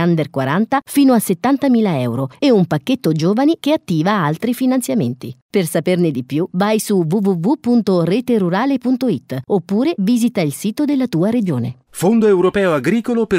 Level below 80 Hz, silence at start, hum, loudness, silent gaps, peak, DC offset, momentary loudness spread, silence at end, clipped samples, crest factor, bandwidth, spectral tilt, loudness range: -56 dBFS; 0 s; none; -16 LUFS; 5.42-5.49 s; -2 dBFS; under 0.1%; 6 LU; 0 s; under 0.1%; 14 dB; 16 kHz; -6.5 dB/octave; 2 LU